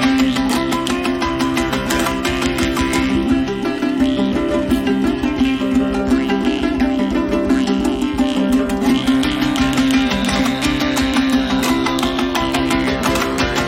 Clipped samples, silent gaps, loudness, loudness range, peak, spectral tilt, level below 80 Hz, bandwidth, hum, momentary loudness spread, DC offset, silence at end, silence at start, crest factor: under 0.1%; none; -17 LUFS; 1 LU; -2 dBFS; -4.5 dB/octave; -32 dBFS; 16.5 kHz; none; 3 LU; 0.1%; 0 s; 0 s; 16 dB